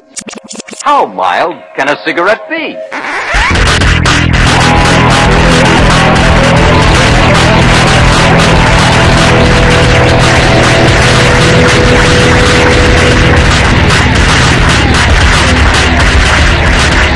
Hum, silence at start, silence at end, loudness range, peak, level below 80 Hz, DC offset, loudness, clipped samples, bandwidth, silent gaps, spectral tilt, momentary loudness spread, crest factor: none; 0.15 s; 0 s; 4 LU; 0 dBFS; -14 dBFS; under 0.1%; -6 LUFS; 4%; 12 kHz; none; -4.5 dB/octave; 6 LU; 6 dB